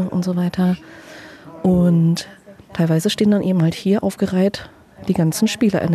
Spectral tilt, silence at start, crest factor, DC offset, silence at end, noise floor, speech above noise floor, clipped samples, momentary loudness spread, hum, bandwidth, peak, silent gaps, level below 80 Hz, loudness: -6.5 dB/octave; 0 s; 12 dB; under 0.1%; 0 s; -38 dBFS; 21 dB; under 0.1%; 19 LU; none; 14 kHz; -6 dBFS; none; -50 dBFS; -18 LUFS